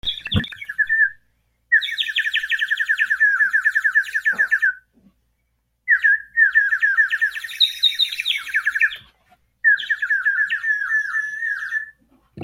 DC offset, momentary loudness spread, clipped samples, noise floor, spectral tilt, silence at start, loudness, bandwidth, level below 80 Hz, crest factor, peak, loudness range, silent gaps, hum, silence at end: under 0.1%; 8 LU; under 0.1%; -70 dBFS; -2 dB/octave; 0.05 s; -18 LUFS; 16.5 kHz; -52 dBFS; 18 dB; -4 dBFS; 3 LU; none; none; 0 s